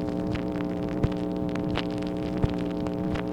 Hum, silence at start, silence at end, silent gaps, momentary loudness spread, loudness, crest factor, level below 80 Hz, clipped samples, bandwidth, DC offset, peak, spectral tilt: none; 0 s; 0 s; none; 2 LU; -29 LUFS; 20 dB; -42 dBFS; under 0.1%; 10.5 kHz; 0.1%; -8 dBFS; -8 dB/octave